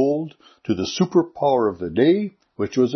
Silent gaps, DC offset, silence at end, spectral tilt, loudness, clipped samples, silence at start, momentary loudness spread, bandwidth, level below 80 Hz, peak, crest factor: none; under 0.1%; 0 s; -6.5 dB/octave; -21 LUFS; under 0.1%; 0 s; 12 LU; 6.4 kHz; -60 dBFS; -4 dBFS; 16 dB